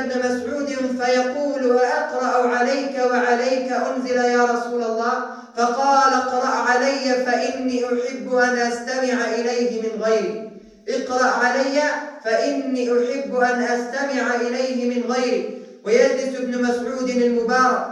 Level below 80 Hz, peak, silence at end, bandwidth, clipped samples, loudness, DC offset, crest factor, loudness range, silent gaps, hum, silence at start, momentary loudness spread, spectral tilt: -68 dBFS; -4 dBFS; 0 s; 10.5 kHz; under 0.1%; -20 LUFS; under 0.1%; 16 dB; 2 LU; none; none; 0 s; 6 LU; -3.5 dB/octave